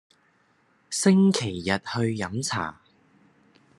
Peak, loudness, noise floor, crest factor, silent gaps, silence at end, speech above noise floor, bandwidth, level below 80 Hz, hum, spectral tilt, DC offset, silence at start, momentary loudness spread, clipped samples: -6 dBFS; -25 LUFS; -65 dBFS; 20 dB; none; 1.05 s; 41 dB; 12 kHz; -66 dBFS; none; -5 dB/octave; under 0.1%; 0.9 s; 12 LU; under 0.1%